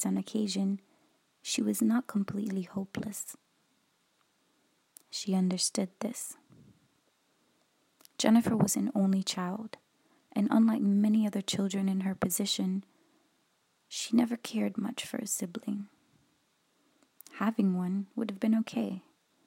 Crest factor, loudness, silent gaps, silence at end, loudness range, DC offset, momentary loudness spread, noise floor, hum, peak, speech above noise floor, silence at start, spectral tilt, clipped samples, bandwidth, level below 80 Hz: 22 dB; -31 LUFS; none; 0.45 s; 6 LU; under 0.1%; 14 LU; -73 dBFS; none; -10 dBFS; 43 dB; 0 s; -5 dB/octave; under 0.1%; 16 kHz; -74 dBFS